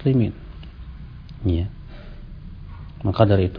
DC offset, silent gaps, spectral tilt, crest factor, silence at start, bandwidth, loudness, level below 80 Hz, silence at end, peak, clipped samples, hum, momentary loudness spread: under 0.1%; none; -11 dB/octave; 22 dB; 0 s; 5.2 kHz; -22 LUFS; -38 dBFS; 0 s; 0 dBFS; under 0.1%; none; 22 LU